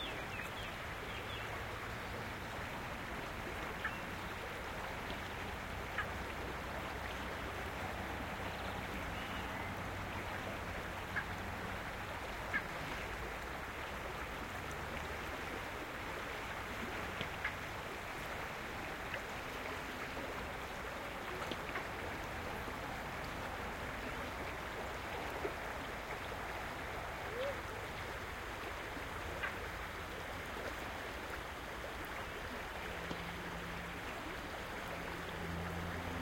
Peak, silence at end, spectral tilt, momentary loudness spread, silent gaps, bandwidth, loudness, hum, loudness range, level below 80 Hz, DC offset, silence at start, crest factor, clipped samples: -20 dBFS; 0 s; -4.5 dB/octave; 3 LU; none; 16.5 kHz; -43 LUFS; none; 1 LU; -54 dBFS; under 0.1%; 0 s; 22 dB; under 0.1%